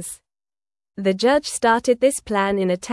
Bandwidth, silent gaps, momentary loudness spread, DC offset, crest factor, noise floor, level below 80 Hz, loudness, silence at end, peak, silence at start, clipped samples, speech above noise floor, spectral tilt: 12 kHz; none; 7 LU; under 0.1%; 16 dB; under -90 dBFS; -54 dBFS; -19 LUFS; 0 s; -4 dBFS; 0 s; under 0.1%; over 71 dB; -4 dB/octave